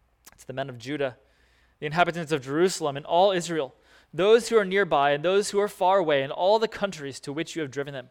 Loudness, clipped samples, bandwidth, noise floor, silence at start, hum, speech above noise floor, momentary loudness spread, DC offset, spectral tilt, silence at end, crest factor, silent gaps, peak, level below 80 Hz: -25 LUFS; under 0.1%; 17 kHz; -62 dBFS; 0.4 s; none; 38 dB; 13 LU; under 0.1%; -4.5 dB/octave; 0.1 s; 20 dB; none; -4 dBFS; -62 dBFS